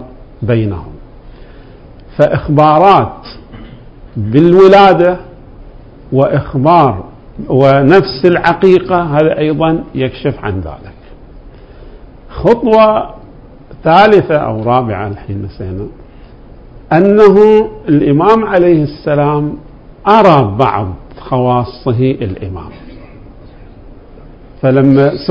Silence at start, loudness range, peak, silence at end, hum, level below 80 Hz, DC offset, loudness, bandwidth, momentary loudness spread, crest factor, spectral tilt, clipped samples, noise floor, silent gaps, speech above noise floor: 0 s; 7 LU; 0 dBFS; 0 s; none; -34 dBFS; under 0.1%; -10 LUFS; 8 kHz; 17 LU; 10 dB; -8.5 dB/octave; 2%; -35 dBFS; none; 25 dB